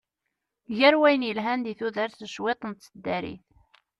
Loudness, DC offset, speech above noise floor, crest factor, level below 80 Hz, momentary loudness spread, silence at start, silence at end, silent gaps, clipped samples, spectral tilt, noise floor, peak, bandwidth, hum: -25 LUFS; under 0.1%; 57 dB; 20 dB; -66 dBFS; 16 LU; 0.7 s; 0.65 s; none; under 0.1%; -5 dB/octave; -83 dBFS; -8 dBFS; 11.5 kHz; none